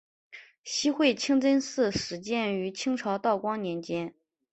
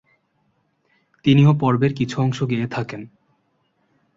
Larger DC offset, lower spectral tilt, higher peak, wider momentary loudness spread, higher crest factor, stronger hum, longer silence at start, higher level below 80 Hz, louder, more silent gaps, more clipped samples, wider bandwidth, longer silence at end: neither; second, -4 dB/octave vs -7.5 dB/octave; second, -10 dBFS vs -4 dBFS; second, 9 LU vs 14 LU; about the same, 18 dB vs 18 dB; neither; second, 0.3 s vs 1.25 s; second, -64 dBFS vs -56 dBFS; second, -28 LUFS vs -19 LUFS; first, 0.58-0.64 s vs none; neither; first, 8.4 kHz vs 7.6 kHz; second, 0.4 s vs 1.1 s